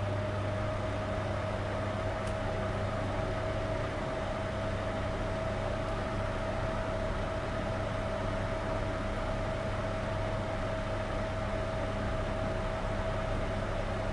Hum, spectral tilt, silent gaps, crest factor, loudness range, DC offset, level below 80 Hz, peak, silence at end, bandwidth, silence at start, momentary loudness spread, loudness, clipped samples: none; -6.5 dB/octave; none; 12 dB; 0 LU; under 0.1%; -40 dBFS; -20 dBFS; 0 s; 11.5 kHz; 0 s; 1 LU; -34 LUFS; under 0.1%